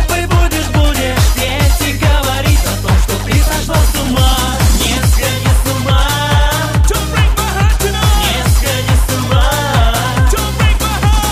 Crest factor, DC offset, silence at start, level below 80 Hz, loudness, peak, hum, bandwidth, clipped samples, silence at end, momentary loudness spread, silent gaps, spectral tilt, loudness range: 10 dB; under 0.1%; 0 s; -14 dBFS; -13 LUFS; 0 dBFS; none; 15.5 kHz; under 0.1%; 0 s; 1 LU; none; -4.5 dB/octave; 0 LU